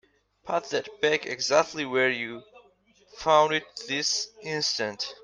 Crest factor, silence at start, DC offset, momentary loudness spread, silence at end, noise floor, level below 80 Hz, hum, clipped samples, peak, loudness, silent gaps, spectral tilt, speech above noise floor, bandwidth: 22 dB; 0.45 s; under 0.1%; 10 LU; 0.1 s; -61 dBFS; -68 dBFS; none; under 0.1%; -6 dBFS; -26 LUFS; none; -2 dB/octave; 35 dB; 10.5 kHz